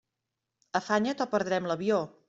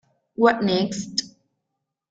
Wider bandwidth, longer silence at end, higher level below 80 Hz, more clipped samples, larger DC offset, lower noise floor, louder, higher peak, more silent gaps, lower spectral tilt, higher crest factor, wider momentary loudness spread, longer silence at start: second, 7.8 kHz vs 9 kHz; second, 0.2 s vs 0.8 s; second, -72 dBFS vs -62 dBFS; neither; neither; first, -86 dBFS vs -81 dBFS; second, -29 LUFS vs -22 LUFS; second, -12 dBFS vs -4 dBFS; neither; about the same, -5 dB/octave vs -4.5 dB/octave; about the same, 20 dB vs 22 dB; second, 4 LU vs 9 LU; first, 0.75 s vs 0.4 s